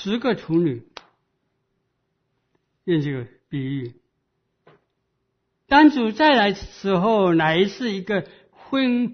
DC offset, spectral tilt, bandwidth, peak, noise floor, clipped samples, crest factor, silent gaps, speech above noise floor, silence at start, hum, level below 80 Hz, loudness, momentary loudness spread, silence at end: under 0.1%; -6.5 dB/octave; 6.6 kHz; -2 dBFS; -74 dBFS; under 0.1%; 20 dB; none; 54 dB; 0 s; none; -54 dBFS; -20 LUFS; 15 LU; 0 s